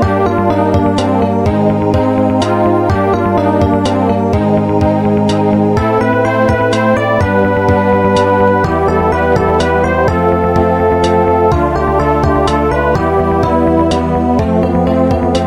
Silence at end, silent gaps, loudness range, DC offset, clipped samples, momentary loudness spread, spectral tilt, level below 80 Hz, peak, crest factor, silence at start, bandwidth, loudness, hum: 0 s; none; 1 LU; under 0.1%; under 0.1%; 2 LU; -7.5 dB/octave; -26 dBFS; 0 dBFS; 10 dB; 0 s; 13.5 kHz; -12 LUFS; none